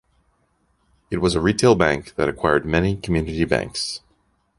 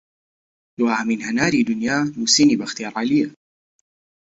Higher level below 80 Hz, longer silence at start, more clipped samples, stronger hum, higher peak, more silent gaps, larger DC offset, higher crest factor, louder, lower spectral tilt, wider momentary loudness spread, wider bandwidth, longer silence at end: first, -38 dBFS vs -58 dBFS; first, 1.1 s vs 0.8 s; neither; neither; about the same, -2 dBFS vs -4 dBFS; neither; neither; about the same, 20 dB vs 18 dB; about the same, -20 LUFS vs -19 LUFS; first, -5.5 dB/octave vs -3 dB/octave; about the same, 10 LU vs 9 LU; first, 11.5 kHz vs 8 kHz; second, 0.6 s vs 0.95 s